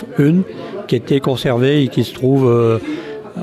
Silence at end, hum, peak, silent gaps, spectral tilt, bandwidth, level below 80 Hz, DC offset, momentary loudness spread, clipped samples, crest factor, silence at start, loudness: 0 s; none; -4 dBFS; none; -7.5 dB/octave; 14.5 kHz; -50 dBFS; under 0.1%; 12 LU; under 0.1%; 12 dB; 0 s; -15 LUFS